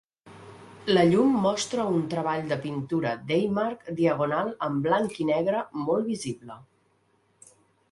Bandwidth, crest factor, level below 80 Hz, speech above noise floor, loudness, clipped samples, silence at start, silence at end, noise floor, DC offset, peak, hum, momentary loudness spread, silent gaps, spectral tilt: 11.5 kHz; 18 dB; -66 dBFS; 42 dB; -26 LUFS; under 0.1%; 0.25 s; 1.3 s; -67 dBFS; under 0.1%; -8 dBFS; none; 11 LU; none; -6 dB/octave